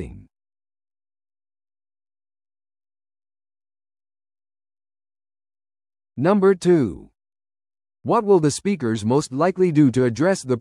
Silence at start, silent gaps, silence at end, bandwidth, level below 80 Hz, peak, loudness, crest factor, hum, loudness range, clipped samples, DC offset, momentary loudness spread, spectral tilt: 0 s; none; 0 s; 12 kHz; -56 dBFS; -6 dBFS; -19 LUFS; 18 dB; none; 4 LU; under 0.1%; under 0.1%; 8 LU; -6.5 dB/octave